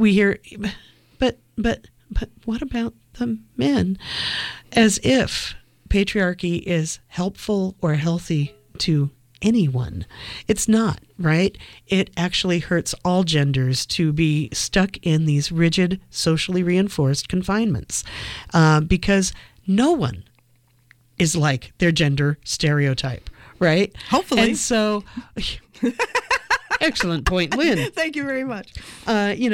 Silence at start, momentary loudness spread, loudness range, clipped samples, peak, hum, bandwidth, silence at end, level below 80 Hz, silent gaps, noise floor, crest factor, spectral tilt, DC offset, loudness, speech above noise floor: 0 s; 11 LU; 3 LU; under 0.1%; -6 dBFS; none; 16.5 kHz; 0 s; -38 dBFS; none; -59 dBFS; 16 dB; -5 dB/octave; under 0.1%; -21 LUFS; 38 dB